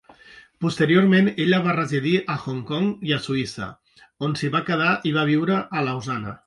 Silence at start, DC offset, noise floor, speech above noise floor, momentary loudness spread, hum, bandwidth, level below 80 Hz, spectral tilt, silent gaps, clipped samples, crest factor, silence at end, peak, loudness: 0.35 s; under 0.1%; -49 dBFS; 27 dB; 10 LU; none; 11.5 kHz; -58 dBFS; -6.5 dB/octave; none; under 0.1%; 16 dB; 0.1 s; -6 dBFS; -22 LUFS